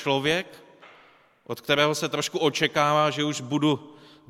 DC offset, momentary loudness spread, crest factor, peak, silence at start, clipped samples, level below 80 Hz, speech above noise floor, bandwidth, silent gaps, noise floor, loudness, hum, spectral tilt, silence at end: under 0.1%; 9 LU; 20 dB; -6 dBFS; 0 s; under 0.1%; -64 dBFS; 32 dB; 16 kHz; none; -57 dBFS; -24 LUFS; none; -4 dB/octave; 0.35 s